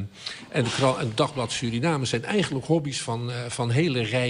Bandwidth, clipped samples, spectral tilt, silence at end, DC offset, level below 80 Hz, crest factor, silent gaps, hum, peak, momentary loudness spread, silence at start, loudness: 11 kHz; under 0.1%; -5 dB/octave; 0 s; under 0.1%; -56 dBFS; 16 dB; none; none; -10 dBFS; 6 LU; 0 s; -26 LUFS